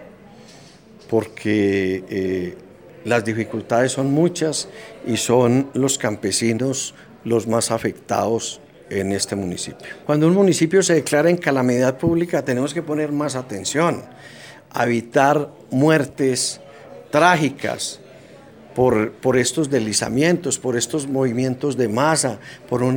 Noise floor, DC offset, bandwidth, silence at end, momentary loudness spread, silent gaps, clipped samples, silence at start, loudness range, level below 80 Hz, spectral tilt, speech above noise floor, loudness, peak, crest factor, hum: -45 dBFS; under 0.1%; 18 kHz; 0 s; 12 LU; none; under 0.1%; 0 s; 4 LU; -56 dBFS; -4.5 dB/octave; 26 dB; -20 LUFS; 0 dBFS; 20 dB; none